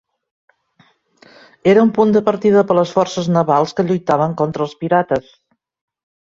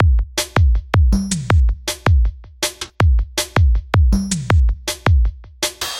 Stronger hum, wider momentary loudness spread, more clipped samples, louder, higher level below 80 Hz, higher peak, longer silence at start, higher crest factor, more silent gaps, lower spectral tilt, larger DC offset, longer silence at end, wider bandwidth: neither; about the same, 7 LU vs 7 LU; neither; first, -15 LUFS vs -18 LUFS; second, -56 dBFS vs -18 dBFS; about the same, -2 dBFS vs -2 dBFS; first, 1.65 s vs 0 s; about the same, 16 dB vs 14 dB; neither; first, -7 dB/octave vs -5 dB/octave; neither; first, 1.1 s vs 0 s; second, 7.6 kHz vs 15.5 kHz